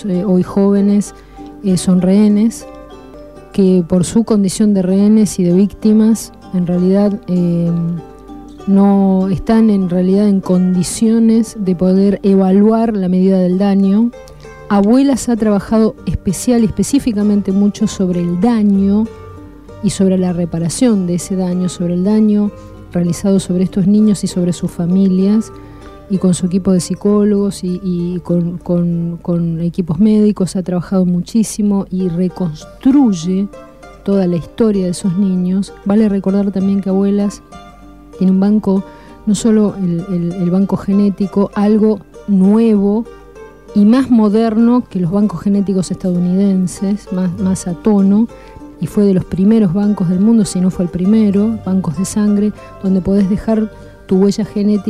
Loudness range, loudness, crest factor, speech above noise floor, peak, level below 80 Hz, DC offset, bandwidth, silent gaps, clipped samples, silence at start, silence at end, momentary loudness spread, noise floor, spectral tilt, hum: 3 LU; -14 LUFS; 10 dB; 24 dB; -2 dBFS; -40 dBFS; 0.3%; 13 kHz; none; under 0.1%; 0 s; 0 s; 8 LU; -37 dBFS; -7.5 dB/octave; none